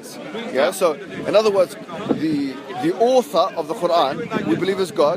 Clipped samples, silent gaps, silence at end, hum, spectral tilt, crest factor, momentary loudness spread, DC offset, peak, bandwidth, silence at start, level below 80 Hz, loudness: under 0.1%; none; 0 s; none; -5 dB/octave; 16 dB; 9 LU; under 0.1%; -2 dBFS; 15.5 kHz; 0 s; -66 dBFS; -20 LUFS